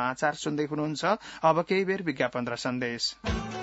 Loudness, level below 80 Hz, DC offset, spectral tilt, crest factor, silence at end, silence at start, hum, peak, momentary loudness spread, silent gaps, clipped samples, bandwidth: -28 LUFS; -48 dBFS; under 0.1%; -4.5 dB/octave; 20 dB; 0 s; 0 s; none; -10 dBFS; 6 LU; none; under 0.1%; 8 kHz